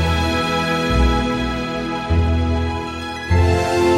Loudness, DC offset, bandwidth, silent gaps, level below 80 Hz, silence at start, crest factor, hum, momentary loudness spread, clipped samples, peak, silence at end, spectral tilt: -19 LUFS; under 0.1%; 13 kHz; none; -26 dBFS; 0 s; 12 dB; none; 7 LU; under 0.1%; -4 dBFS; 0 s; -6 dB/octave